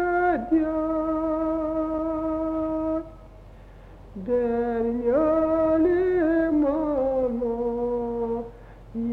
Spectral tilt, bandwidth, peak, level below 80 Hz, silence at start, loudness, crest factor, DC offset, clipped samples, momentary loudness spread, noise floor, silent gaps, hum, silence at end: -9.5 dB/octave; 4.3 kHz; -12 dBFS; -46 dBFS; 0 s; -24 LUFS; 12 dB; under 0.1%; under 0.1%; 9 LU; -45 dBFS; none; none; 0 s